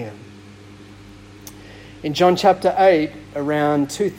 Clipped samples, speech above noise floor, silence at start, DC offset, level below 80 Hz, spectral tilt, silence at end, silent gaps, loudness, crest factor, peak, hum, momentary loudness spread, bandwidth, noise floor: under 0.1%; 24 dB; 0 s; under 0.1%; -52 dBFS; -5.5 dB/octave; 0 s; none; -18 LUFS; 18 dB; -2 dBFS; none; 24 LU; 16.5 kHz; -42 dBFS